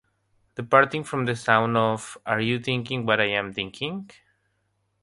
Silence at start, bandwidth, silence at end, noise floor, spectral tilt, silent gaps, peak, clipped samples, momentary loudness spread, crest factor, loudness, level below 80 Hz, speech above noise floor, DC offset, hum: 0.6 s; 11.5 kHz; 0.95 s; -72 dBFS; -5 dB/octave; none; -2 dBFS; under 0.1%; 12 LU; 24 dB; -24 LUFS; -62 dBFS; 48 dB; under 0.1%; none